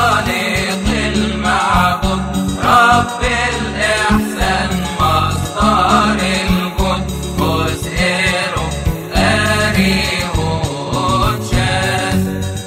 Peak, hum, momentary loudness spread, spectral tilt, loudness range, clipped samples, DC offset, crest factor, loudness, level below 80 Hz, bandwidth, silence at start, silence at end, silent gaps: 0 dBFS; none; 6 LU; -4.5 dB/octave; 2 LU; under 0.1%; under 0.1%; 14 dB; -15 LUFS; -26 dBFS; 16 kHz; 0 s; 0 s; none